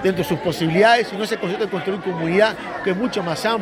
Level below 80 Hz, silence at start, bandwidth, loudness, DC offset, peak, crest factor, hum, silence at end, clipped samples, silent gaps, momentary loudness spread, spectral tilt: -54 dBFS; 0 s; 16 kHz; -20 LUFS; under 0.1%; -2 dBFS; 18 dB; none; 0 s; under 0.1%; none; 9 LU; -5.5 dB/octave